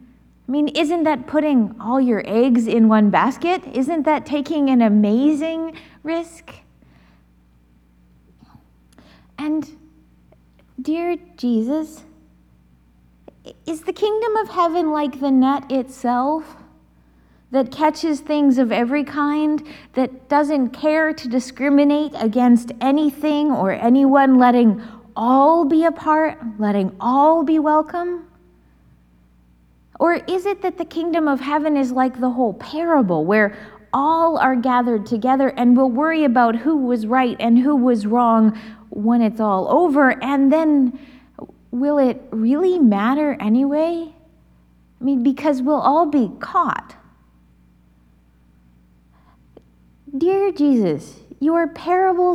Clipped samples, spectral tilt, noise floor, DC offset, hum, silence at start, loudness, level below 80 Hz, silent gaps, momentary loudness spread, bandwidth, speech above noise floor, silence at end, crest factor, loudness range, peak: under 0.1%; -6.5 dB/octave; -54 dBFS; under 0.1%; none; 0.5 s; -18 LUFS; -56 dBFS; none; 10 LU; 12.5 kHz; 37 dB; 0 s; 18 dB; 10 LU; 0 dBFS